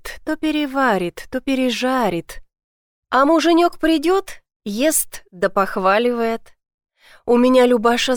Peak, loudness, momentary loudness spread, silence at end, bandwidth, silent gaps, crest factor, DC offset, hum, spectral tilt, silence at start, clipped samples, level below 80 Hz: -4 dBFS; -18 LUFS; 13 LU; 0 s; 19.5 kHz; 2.64-3.03 s, 4.56-4.60 s, 6.74-6.78 s; 14 dB; under 0.1%; none; -3.5 dB/octave; 0.05 s; under 0.1%; -46 dBFS